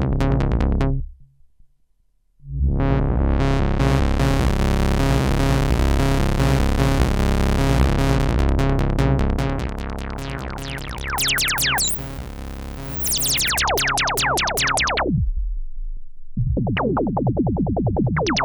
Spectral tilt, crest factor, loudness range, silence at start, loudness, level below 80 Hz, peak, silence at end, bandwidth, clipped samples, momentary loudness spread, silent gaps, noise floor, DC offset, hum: -4.5 dB/octave; 16 dB; 3 LU; 0 s; -20 LUFS; -24 dBFS; -4 dBFS; 0 s; over 20 kHz; under 0.1%; 12 LU; none; -63 dBFS; under 0.1%; none